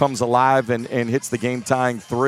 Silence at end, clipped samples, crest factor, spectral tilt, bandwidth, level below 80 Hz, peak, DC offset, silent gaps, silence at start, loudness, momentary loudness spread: 0 s; under 0.1%; 18 dB; -5.5 dB/octave; 15.5 kHz; -62 dBFS; -2 dBFS; under 0.1%; none; 0 s; -20 LUFS; 7 LU